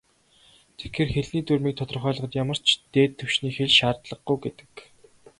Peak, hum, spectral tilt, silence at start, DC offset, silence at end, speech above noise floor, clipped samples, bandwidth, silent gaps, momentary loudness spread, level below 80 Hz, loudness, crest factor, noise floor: -4 dBFS; none; -5 dB/octave; 0.8 s; under 0.1%; 0.6 s; 34 dB; under 0.1%; 11.5 kHz; none; 11 LU; -52 dBFS; -24 LUFS; 22 dB; -59 dBFS